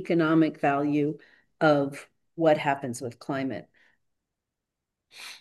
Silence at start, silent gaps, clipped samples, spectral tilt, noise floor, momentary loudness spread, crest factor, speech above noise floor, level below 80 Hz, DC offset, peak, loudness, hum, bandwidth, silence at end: 0 s; none; under 0.1%; -6.5 dB/octave; -86 dBFS; 20 LU; 18 dB; 60 dB; -76 dBFS; under 0.1%; -8 dBFS; -26 LUFS; none; 12.5 kHz; 0.05 s